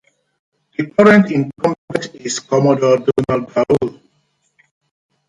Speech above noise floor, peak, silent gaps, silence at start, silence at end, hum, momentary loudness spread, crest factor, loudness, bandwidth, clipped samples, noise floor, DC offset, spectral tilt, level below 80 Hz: 49 dB; 0 dBFS; 1.78-1.88 s; 0.8 s; 1.35 s; none; 14 LU; 16 dB; -15 LUFS; 11 kHz; under 0.1%; -64 dBFS; under 0.1%; -6 dB/octave; -52 dBFS